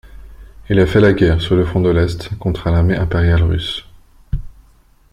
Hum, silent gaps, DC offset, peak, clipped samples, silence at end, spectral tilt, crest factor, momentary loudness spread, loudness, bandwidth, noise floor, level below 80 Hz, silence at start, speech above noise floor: none; none; under 0.1%; -2 dBFS; under 0.1%; 0.65 s; -8 dB/octave; 14 dB; 16 LU; -15 LUFS; 10 kHz; -49 dBFS; -28 dBFS; 0.15 s; 36 dB